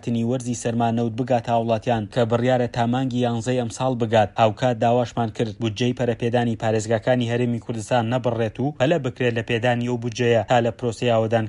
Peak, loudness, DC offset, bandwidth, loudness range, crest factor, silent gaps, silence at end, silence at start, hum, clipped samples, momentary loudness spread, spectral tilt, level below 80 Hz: -4 dBFS; -22 LUFS; under 0.1%; 11.5 kHz; 1 LU; 16 dB; none; 0 s; 0.05 s; none; under 0.1%; 5 LU; -6.5 dB/octave; -52 dBFS